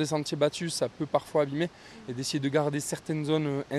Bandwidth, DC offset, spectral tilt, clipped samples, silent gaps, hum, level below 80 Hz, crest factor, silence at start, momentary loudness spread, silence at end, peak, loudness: 13.5 kHz; under 0.1%; -5 dB/octave; under 0.1%; none; none; -66 dBFS; 18 dB; 0 s; 6 LU; 0 s; -10 dBFS; -29 LUFS